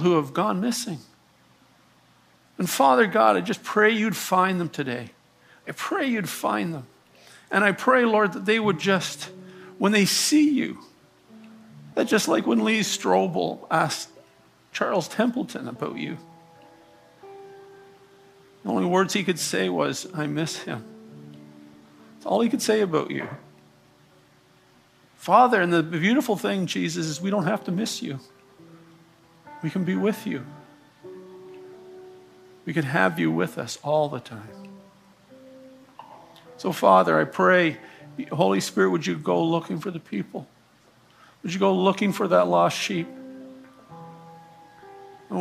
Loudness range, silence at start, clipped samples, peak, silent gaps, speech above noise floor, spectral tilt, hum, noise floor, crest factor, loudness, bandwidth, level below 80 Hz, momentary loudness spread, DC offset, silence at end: 8 LU; 0 s; under 0.1%; -4 dBFS; none; 36 dB; -4.5 dB/octave; none; -58 dBFS; 22 dB; -23 LUFS; 15.5 kHz; -72 dBFS; 23 LU; under 0.1%; 0 s